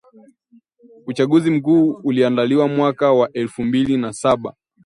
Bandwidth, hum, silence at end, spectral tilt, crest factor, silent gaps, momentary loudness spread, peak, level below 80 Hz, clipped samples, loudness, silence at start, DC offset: 11 kHz; none; 0.35 s; -6.5 dB/octave; 16 dB; none; 7 LU; -2 dBFS; -56 dBFS; under 0.1%; -17 LUFS; 1.05 s; under 0.1%